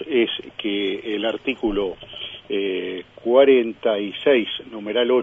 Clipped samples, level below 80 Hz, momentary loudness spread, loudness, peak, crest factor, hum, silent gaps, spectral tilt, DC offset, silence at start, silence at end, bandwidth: under 0.1%; -50 dBFS; 13 LU; -21 LUFS; -2 dBFS; 20 dB; none; none; -6.5 dB/octave; under 0.1%; 0 s; 0 s; 3.8 kHz